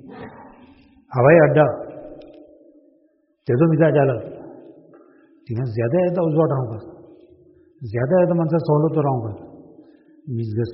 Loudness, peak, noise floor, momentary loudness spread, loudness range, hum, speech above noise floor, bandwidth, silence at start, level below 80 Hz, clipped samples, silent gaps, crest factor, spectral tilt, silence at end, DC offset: -19 LUFS; -2 dBFS; -62 dBFS; 24 LU; 5 LU; none; 44 dB; 5.6 kHz; 0.05 s; -56 dBFS; under 0.1%; none; 20 dB; -8.5 dB/octave; 0 s; under 0.1%